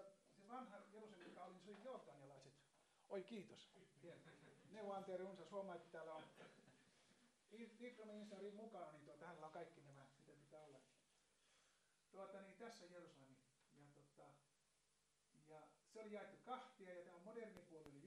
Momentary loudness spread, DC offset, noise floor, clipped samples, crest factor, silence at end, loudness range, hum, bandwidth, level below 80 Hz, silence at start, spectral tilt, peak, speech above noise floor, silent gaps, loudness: 13 LU; under 0.1%; -85 dBFS; under 0.1%; 20 dB; 0 s; 8 LU; none; 11 kHz; under -90 dBFS; 0 s; -5.5 dB/octave; -40 dBFS; 27 dB; none; -59 LUFS